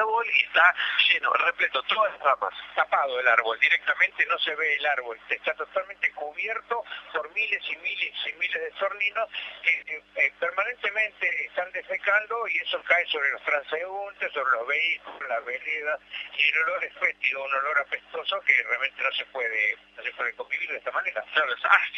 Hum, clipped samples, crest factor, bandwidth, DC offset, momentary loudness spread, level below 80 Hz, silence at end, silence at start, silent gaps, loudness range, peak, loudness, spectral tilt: 50 Hz at -70 dBFS; under 0.1%; 22 dB; 7.2 kHz; under 0.1%; 10 LU; -72 dBFS; 0 s; 0 s; none; 5 LU; -4 dBFS; -25 LUFS; -1 dB/octave